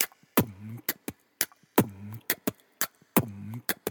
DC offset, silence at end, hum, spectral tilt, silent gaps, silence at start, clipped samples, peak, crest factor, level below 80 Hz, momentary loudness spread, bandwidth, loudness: under 0.1%; 0 s; none; -4 dB/octave; none; 0 s; under 0.1%; -4 dBFS; 28 dB; -64 dBFS; 11 LU; over 20 kHz; -30 LUFS